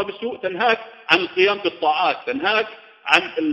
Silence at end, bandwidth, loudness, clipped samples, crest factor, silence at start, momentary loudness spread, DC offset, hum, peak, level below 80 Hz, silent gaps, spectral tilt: 0 s; 10 kHz; -19 LUFS; under 0.1%; 20 dB; 0 s; 10 LU; under 0.1%; none; 0 dBFS; -66 dBFS; none; -3.5 dB/octave